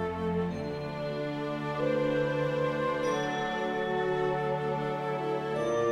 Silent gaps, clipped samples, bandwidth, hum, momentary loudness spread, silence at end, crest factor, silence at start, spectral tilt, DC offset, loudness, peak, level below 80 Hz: none; under 0.1%; 13 kHz; none; 5 LU; 0 s; 12 dB; 0 s; -6.5 dB/octave; under 0.1%; -31 LUFS; -18 dBFS; -60 dBFS